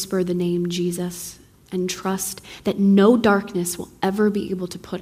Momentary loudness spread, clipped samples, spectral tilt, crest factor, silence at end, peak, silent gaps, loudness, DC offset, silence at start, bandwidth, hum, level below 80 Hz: 14 LU; under 0.1%; -5.5 dB/octave; 18 dB; 0 s; -4 dBFS; none; -21 LUFS; under 0.1%; 0 s; 16 kHz; none; -54 dBFS